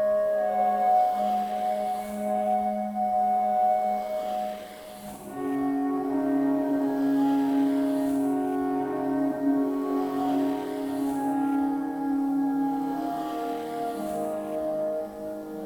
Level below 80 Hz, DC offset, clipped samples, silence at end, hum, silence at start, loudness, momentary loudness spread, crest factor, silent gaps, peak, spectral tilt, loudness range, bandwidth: -62 dBFS; under 0.1%; under 0.1%; 0 s; none; 0 s; -27 LUFS; 8 LU; 12 dB; none; -14 dBFS; -6.5 dB/octave; 3 LU; 18 kHz